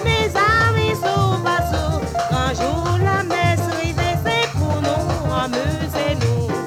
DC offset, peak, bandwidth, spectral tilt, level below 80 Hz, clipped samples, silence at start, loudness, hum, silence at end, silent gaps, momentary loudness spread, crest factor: under 0.1%; -4 dBFS; 16.5 kHz; -5.5 dB/octave; -32 dBFS; under 0.1%; 0 s; -19 LUFS; none; 0 s; none; 6 LU; 16 dB